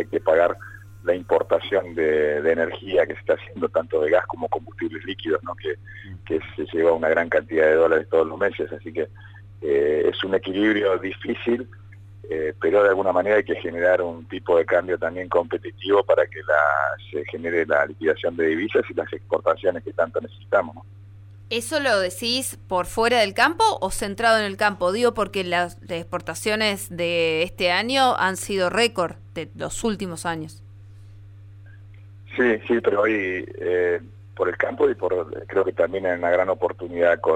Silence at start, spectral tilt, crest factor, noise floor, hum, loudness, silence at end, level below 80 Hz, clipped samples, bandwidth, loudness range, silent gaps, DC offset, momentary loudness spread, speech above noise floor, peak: 0 s; -4 dB/octave; 18 dB; -43 dBFS; none; -22 LUFS; 0 s; -52 dBFS; under 0.1%; 16 kHz; 4 LU; none; under 0.1%; 11 LU; 21 dB; -6 dBFS